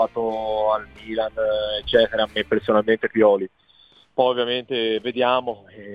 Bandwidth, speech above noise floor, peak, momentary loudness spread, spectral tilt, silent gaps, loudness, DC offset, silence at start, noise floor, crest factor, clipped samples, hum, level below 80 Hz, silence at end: 5 kHz; 33 dB; -4 dBFS; 9 LU; -6.5 dB/octave; none; -21 LUFS; under 0.1%; 0 s; -55 dBFS; 18 dB; under 0.1%; none; -52 dBFS; 0 s